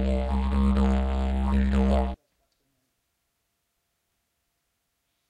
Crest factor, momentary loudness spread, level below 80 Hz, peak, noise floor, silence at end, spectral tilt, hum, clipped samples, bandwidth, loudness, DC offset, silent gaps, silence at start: 16 dB; 4 LU; -30 dBFS; -12 dBFS; -77 dBFS; 3.15 s; -8.5 dB/octave; none; under 0.1%; 8.4 kHz; -25 LUFS; under 0.1%; none; 0 s